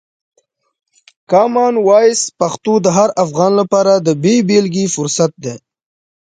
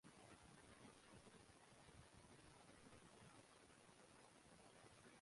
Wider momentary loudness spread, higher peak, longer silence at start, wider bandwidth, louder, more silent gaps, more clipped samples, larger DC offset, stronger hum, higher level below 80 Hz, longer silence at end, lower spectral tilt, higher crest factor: first, 7 LU vs 2 LU; first, 0 dBFS vs -52 dBFS; first, 1.3 s vs 0.05 s; second, 9.6 kHz vs 11.5 kHz; first, -13 LUFS vs -67 LUFS; neither; neither; neither; neither; first, -60 dBFS vs -82 dBFS; first, 0.7 s vs 0 s; first, -5 dB/octave vs -3.5 dB/octave; about the same, 14 dB vs 16 dB